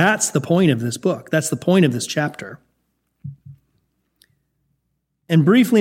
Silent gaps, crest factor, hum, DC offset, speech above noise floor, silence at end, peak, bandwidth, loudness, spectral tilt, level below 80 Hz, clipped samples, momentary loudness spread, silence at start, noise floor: none; 18 dB; none; under 0.1%; 55 dB; 0 s; -2 dBFS; 16.5 kHz; -18 LUFS; -5 dB/octave; -64 dBFS; under 0.1%; 23 LU; 0 s; -72 dBFS